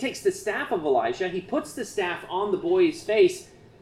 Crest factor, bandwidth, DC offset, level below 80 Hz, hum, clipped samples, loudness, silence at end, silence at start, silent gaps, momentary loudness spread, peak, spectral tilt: 16 dB; 14 kHz; under 0.1%; -60 dBFS; none; under 0.1%; -25 LUFS; 0.35 s; 0 s; none; 8 LU; -10 dBFS; -4.5 dB/octave